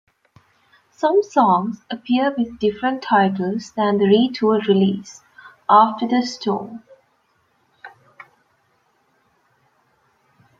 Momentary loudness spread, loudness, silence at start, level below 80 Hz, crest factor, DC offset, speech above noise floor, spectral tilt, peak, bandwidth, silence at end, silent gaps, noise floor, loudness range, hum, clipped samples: 13 LU; -19 LUFS; 1 s; -64 dBFS; 20 dB; under 0.1%; 46 dB; -6.5 dB/octave; 0 dBFS; 7.6 kHz; 2.7 s; none; -64 dBFS; 8 LU; none; under 0.1%